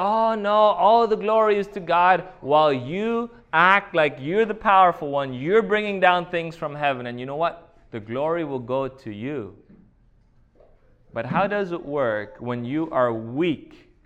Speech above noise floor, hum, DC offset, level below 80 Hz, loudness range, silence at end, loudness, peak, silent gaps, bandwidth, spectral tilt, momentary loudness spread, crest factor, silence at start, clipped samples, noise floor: 36 dB; none; under 0.1%; -56 dBFS; 10 LU; 0.4 s; -22 LUFS; -2 dBFS; none; 8.6 kHz; -7 dB/octave; 14 LU; 20 dB; 0 s; under 0.1%; -57 dBFS